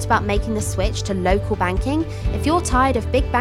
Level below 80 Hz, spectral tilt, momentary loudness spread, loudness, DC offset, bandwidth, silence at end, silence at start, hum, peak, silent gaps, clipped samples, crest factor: -26 dBFS; -5.5 dB/octave; 5 LU; -20 LUFS; under 0.1%; 14.5 kHz; 0 s; 0 s; none; -2 dBFS; none; under 0.1%; 16 dB